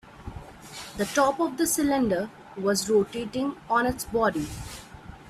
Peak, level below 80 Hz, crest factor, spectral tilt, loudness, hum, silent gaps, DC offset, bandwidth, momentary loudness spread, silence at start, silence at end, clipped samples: -10 dBFS; -50 dBFS; 18 dB; -4 dB/octave; -26 LUFS; none; none; under 0.1%; 16 kHz; 19 LU; 0.05 s; 0 s; under 0.1%